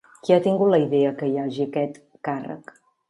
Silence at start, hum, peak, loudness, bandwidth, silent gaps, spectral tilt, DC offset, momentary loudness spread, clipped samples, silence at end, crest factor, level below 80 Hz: 0.25 s; none; -4 dBFS; -22 LUFS; 11 kHz; none; -8 dB/octave; under 0.1%; 14 LU; under 0.1%; 0.5 s; 18 dB; -72 dBFS